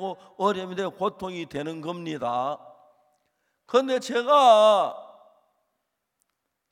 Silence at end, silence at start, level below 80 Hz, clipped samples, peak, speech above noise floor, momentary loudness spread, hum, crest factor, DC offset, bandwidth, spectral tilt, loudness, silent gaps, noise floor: 1.65 s; 0 s; -72 dBFS; under 0.1%; -6 dBFS; 56 dB; 17 LU; none; 20 dB; under 0.1%; 13 kHz; -4.5 dB/octave; -23 LUFS; none; -79 dBFS